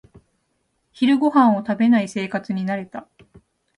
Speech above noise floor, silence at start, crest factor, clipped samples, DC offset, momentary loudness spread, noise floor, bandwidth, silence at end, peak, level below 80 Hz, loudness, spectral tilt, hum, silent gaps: 51 dB; 1 s; 18 dB; under 0.1%; under 0.1%; 12 LU; -70 dBFS; 10.5 kHz; 0.8 s; -4 dBFS; -64 dBFS; -19 LUFS; -6.5 dB/octave; none; none